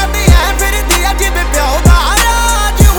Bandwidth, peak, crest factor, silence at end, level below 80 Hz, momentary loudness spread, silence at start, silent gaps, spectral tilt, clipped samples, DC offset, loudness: over 20 kHz; 0 dBFS; 8 dB; 0 s; -12 dBFS; 4 LU; 0 s; none; -3.5 dB/octave; 0.9%; under 0.1%; -10 LUFS